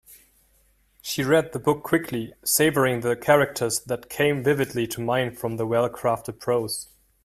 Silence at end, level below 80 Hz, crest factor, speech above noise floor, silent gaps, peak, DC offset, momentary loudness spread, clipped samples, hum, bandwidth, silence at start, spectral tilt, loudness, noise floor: 0.4 s; -58 dBFS; 20 dB; 39 dB; none; -4 dBFS; under 0.1%; 11 LU; under 0.1%; none; 16 kHz; 0.1 s; -4.5 dB/octave; -24 LUFS; -63 dBFS